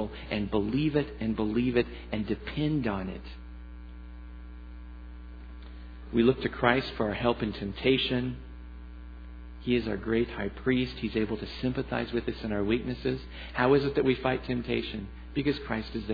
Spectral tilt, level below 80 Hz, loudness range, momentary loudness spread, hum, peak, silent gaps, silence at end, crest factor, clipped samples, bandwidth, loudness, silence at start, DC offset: -8.5 dB/octave; -44 dBFS; 7 LU; 20 LU; none; -6 dBFS; none; 0 s; 26 dB; under 0.1%; 5 kHz; -30 LUFS; 0 s; under 0.1%